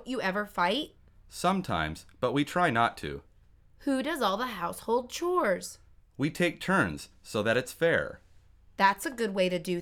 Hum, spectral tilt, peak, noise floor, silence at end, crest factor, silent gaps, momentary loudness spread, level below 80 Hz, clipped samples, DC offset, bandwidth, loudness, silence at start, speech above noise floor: none; -5 dB/octave; -10 dBFS; -59 dBFS; 0 s; 20 dB; none; 12 LU; -56 dBFS; under 0.1%; under 0.1%; 18.5 kHz; -29 LUFS; 0 s; 30 dB